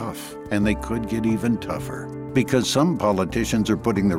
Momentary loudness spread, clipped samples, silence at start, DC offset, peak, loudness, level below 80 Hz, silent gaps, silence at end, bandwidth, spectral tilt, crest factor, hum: 10 LU; under 0.1%; 0 s; under 0.1%; -6 dBFS; -23 LUFS; -40 dBFS; none; 0 s; 16 kHz; -5.5 dB/octave; 16 dB; none